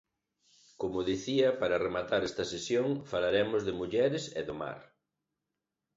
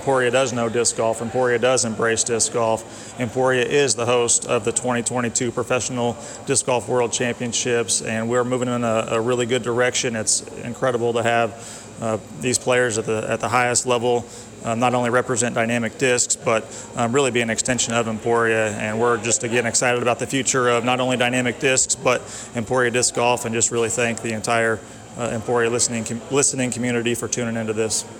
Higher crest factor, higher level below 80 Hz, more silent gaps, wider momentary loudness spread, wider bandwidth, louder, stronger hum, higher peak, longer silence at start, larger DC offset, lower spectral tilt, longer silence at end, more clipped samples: about the same, 18 dB vs 14 dB; second, -62 dBFS vs -54 dBFS; neither; first, 10 LU vs 7 LU; second, 8 kHz vs 17.5 kHz; second, -32 LUFS vs -20 LUFS; neither; second, -16 dBFS vs -6 dBFS; first, 0.8 s vs 0 s; neither; first, -5 dB/octave vs -3 dB/octave; first, 1.15 s vs 0 s; neither